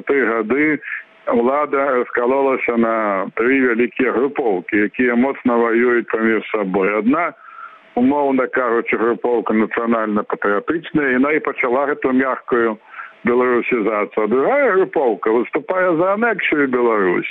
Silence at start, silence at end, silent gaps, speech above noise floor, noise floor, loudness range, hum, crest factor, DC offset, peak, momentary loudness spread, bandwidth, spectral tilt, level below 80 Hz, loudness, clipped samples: 0.05 s; 0 s; none; 21 dB; -38 dBFS; 1 LU; none; 12 dB; under 0.1%; -6 dBFS; 5 LU; 4 kHz; -9 dB/octave; -58 dBFS; -17 LUFS; under 0.1%